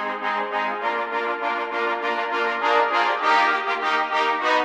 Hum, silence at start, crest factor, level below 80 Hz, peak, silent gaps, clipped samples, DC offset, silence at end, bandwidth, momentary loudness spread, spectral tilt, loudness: none; 0 s; 16 dB; -74 dBFS; -6 dBFS; none; under 0.1%; under 0.1%; 0 s; 11 kHz; 6 LU; -2 dB/octave; -22 LUFS